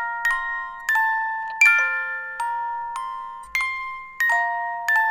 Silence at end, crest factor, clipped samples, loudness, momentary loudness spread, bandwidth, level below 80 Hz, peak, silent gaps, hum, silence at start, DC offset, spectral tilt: 0 s; 18 dB; under 0.1%; -22 LUFS; 14 LU; 16.5 kHz; -56 dBFS; -4 dBFS; none; none; 0 s; under 0.1%; 1.5 dB/octave